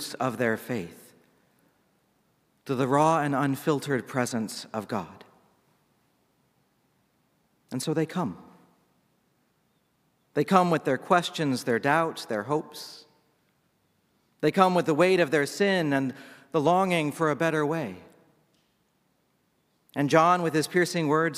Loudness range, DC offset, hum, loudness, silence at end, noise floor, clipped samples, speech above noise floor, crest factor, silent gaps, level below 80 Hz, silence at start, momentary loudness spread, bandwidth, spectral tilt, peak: 11 LU; under 0.1%; none; -26 LUFS; 0 s; -71 dBFS; under 0.1%; 45 dB; 24 dB; none; -72 dBFS; 0 s; 13 LU; 16 kHz; -5.5 dB/octave; -4 dBFS